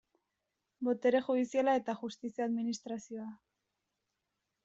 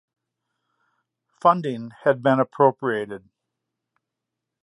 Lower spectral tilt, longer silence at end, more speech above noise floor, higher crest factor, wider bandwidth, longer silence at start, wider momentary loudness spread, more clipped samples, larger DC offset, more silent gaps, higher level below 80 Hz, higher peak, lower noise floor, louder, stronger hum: second, -5 dB/octave vs -8 dB/octave; second, 1.3 s vs 1.45 s; second, 53 dB vs 63 dB; about the same, 18 dB vs 22 dB; second, 7.8 kHz vs 11 kHz; second, 0.8 s vs 1.45 s; about the same, 13 LU vs 11 LU; neither; neither; neither; second, -80 dBFS vs -74 dBFS; second, -18 dBFS vs -4 dBFS; about the same, -86 dBFS vs -84 dBFS; second, -34 LUFS vs -21 LUFS; neither